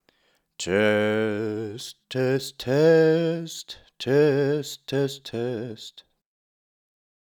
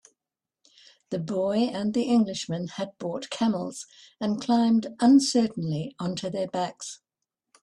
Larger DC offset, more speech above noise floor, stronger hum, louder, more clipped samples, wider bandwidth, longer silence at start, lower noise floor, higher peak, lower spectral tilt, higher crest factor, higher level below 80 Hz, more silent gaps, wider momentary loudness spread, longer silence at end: neither; second, 44 dB vs 64 dB; neither; about the same, -24 LUFS vs -26 LUFS; neither; first, 19 kHz vs 11.5 kHz; second, 0.6 s vs 1.1 s; second, -68 dBFS vs -90 dBFS; about the same, -8 dBFS vs -10 dBFS; about the same, -5.5 dB/octave vs -5.5 dB/octave; about the same, 18 dB vs 18 dB; about the same, -66 dBFS vs -70 dBFS; neither; about the same, 17 LU vs 15 LU; first, 1.2 s vs 0.65 s